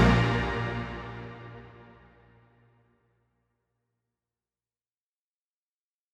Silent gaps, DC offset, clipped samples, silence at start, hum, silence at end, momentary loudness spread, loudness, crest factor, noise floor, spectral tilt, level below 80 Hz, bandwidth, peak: none; under 0.1%; under 0.1%; 0 s; none; 4.3 s; 25 LU; -29 LUFS; 24 dB; under -90 dBFS; -7 dB/octave; -42 dBFS; 8.8 kHz; -8 dBFS